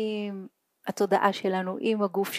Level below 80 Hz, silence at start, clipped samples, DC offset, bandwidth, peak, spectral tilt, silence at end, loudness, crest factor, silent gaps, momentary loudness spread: -84 dBFS; 0 s; under 0.1%; under 0.1%; 15.5 kHz; -8 dBFS; -5 dB/octave; 0 s; -27 LUFS; 20 dB; none; 14 LU